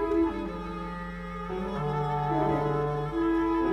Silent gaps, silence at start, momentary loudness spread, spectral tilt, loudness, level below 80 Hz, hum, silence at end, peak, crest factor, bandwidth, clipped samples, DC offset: none; 0 s; 10 LU; -8.5 dB/octave; -30 LUFS; -44 dBFS; none; 0 s; -16 dBFS; 14 dB; 8.4 kHz; under 0.1%; under 0.1%